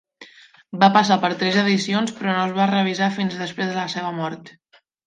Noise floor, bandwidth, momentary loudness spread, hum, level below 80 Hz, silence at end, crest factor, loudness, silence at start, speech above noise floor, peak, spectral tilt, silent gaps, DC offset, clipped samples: -49 dBFS; 9.4 kHz; 11 LU; none; -70 dBFS; 0.55 s; 20 dB; -20 LUFS; 0.2 s; 29 dB; -2 dBFS; -5 dB/octave; none; under 0.1%; under 0.1%